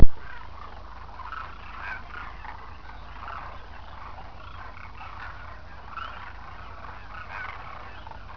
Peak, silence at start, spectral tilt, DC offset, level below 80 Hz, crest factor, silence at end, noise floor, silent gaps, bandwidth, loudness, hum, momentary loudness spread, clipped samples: 0 dBFS; 0 s; -4.5 dB/octave; under 0.1%; -36 dBFS; 24 dB; 6.45 s; -43 dBFS; none; 5.4 kHz; -39 LUFS; none; 7 LU; under 0.1%